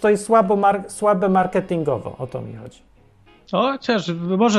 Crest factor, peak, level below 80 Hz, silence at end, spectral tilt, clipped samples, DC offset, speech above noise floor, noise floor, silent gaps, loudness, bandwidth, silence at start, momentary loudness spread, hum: 16 dB; -4 dBFS; -54 dBFS; 0 s; -6 dB/octave; under 0.1%; under 0.1%; 33 dB; -52 dBFS; none; -20 LUFS; 12.5 kHz; 0 s; 14 LU; none